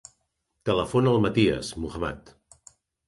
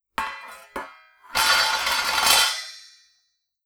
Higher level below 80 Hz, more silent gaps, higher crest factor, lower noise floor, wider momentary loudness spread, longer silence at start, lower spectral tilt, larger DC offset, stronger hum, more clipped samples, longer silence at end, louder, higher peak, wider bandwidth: first, -48 dBFS vs -54 dBFS; neither; about the same, 20 dB vs 22 dB; first, -76 dBFS vs -71 dBFS; second, 12 LU vs 21 LU; first, 0.65 s vs 0.2 s; first, -6.5 dB/octave vs 1.5 dB/octave; neither; neither; neither; about the same, 0.8 s vs 0.85 s; second, -25 LUFS vs -20 LUFS; second, -8 dBFS vs -2 dBFS; second, 11.5 kHz vs over 20 kHz